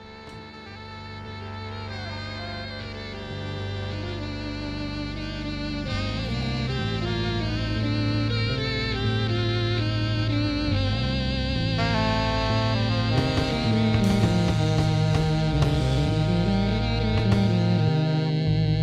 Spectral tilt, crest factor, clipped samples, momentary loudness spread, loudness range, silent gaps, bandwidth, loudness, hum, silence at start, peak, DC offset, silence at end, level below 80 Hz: -6.5 dB/octave; 18 dB; under 0.1%; 12 LU; 10 LU; none; 10 kHz; -25 LUFS; none; 0 s; -6 dBFS; under 0.1%; 0 s; -36 dBFS